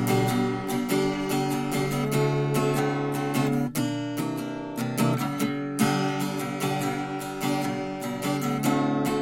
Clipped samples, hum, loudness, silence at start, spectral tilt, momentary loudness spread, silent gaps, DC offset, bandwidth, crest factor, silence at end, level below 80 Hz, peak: under 0.1%; none; -27 LUFS; 0 s; -5.5 dB/octave; 6 LU; none; under 0.1%; 17 kHz; 16 dB; 0 s; -54 dBFS; -10 dBFS